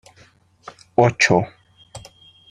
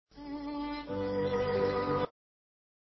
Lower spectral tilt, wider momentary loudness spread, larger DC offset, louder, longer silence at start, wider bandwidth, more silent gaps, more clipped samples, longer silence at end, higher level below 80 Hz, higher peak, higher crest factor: about the same, -4.5 dB/octave vs -5 dB/octave; first, 25 LU vs 9 LU; neither; first, -17 LUFS vs -33 LUFS; first, 1 s vs 0.15 s; first, 11.5 kHz vs 6 kHz; neither; neither; second, 0.5 s vs 0.75 s; about the same, -56 dBFS vs -56 dBFS; first, -2 dBFS vs -18 dBFS; about the same, 20 dB vs 16 dB